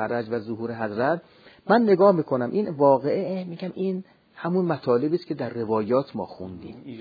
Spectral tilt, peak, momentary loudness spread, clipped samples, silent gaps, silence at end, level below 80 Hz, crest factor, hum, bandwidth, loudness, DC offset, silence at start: -10 dB/octave; -4 dBFS; 15 LU; under 0.1%; none; 0 s; -68 dBFS; 20 dB; none; 5 kHz; -24 LUFS; under 0.1%; 0 s